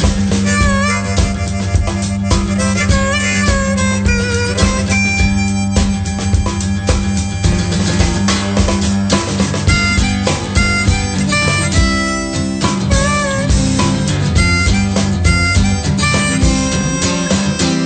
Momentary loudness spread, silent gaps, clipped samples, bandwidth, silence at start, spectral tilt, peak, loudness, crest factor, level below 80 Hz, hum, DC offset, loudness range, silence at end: 4 LU; none; under 0.1%; 9.2 kHz; 0 s; -4.5 dB/octave; 0 dBFS; -14 LUFS; 14 dB; -22 dBFS; none; under 0.1%; 2 LU; 0 s